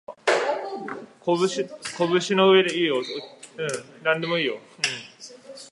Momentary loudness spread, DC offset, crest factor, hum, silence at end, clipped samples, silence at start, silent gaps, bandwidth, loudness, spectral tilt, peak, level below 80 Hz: 18 LU; under 0.1%; 20 dB; none; 0.05 s; under 0.1%; 0.1 s; none; 11.5 kHz; -24 LUFS; -4 dB/octave; -4 dBFS; -76 dBFS